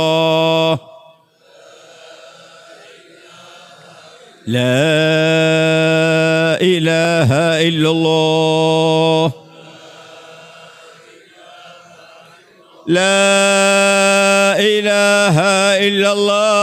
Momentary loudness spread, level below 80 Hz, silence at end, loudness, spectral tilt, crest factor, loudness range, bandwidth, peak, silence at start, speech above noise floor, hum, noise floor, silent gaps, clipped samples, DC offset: 4 LU; -58 dBFS; 0 s; -13 LUFS; -4 dB/octave; 12 dB; 11 LU; 14.5 kHz; -4 dBFS; 0 s; 35 dB; none; -48 dBFS; none; under 0.1%; under 0.1%